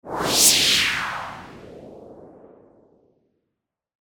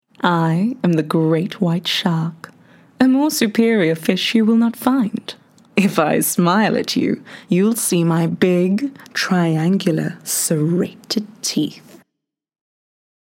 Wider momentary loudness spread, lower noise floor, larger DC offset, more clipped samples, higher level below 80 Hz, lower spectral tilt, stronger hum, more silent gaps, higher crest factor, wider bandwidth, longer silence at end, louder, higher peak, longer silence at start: first, 21 LU vs 7 LU; about the same, -81 dBFS vs -79 dBFS; neither; neither; first, -54 dBFS vs -68 dBFS; second, 0 dB/octave vs -5 dB/octave; neither; neither; about the same, 22 dB vs 18 dB; first, over 20 kHz vs 16.5 kHz; first, 1.8 s vs 1.5 s; about the same, -17 LUFS vs -18 LUFS; about the same, -2 dBFS vs 0 dBFS; second, 0.05 s vs 0.25 s